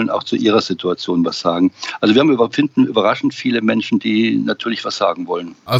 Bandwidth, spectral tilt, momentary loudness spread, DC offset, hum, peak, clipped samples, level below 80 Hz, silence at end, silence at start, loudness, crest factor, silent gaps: 15 kHz; -5.5 dB/octave; 7 LU; under 0.1%; none; -2 dBFS; under 0.1%; -64 dBFS; 0 s; 0 s; -17 LUFS; 14 dB; none